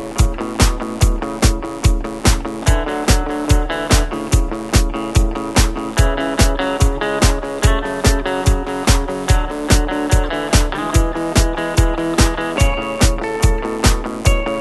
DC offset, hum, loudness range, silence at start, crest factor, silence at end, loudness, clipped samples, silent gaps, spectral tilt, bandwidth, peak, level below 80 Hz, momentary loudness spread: under 0.1%; none; 1 LU; 0 s; 16 dB; 0 s; -17 LUFS; under 0.1%; none; -4.5 dB/octave; 12.5 kHz; 0 dBFS; -18 dBFS; 2 LU